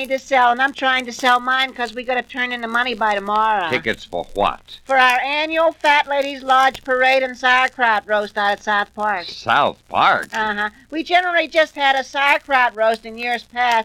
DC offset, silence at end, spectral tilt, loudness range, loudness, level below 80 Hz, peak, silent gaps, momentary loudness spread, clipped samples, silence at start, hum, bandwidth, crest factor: under 0.1%; 0 s; -2.5 dB/octave; 3 LU; -17 LUFS; -50 dBFS; 0 dBFS; none; 8 LU; under 0.1%; 0 s; none; 16.5 kHz; 18 dB